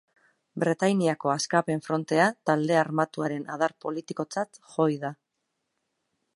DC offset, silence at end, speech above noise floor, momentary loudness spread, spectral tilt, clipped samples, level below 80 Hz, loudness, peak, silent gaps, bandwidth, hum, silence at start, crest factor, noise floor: under 0.1%; 1.2 s; 54 dB; 10 LU; -5.5 dB/octave; under 0.1%; -76 dBFS; -27 LUFS; -6 dBFS; none; 11.5 kHz; none; 0.55 s; 22 dB; -80 dBFS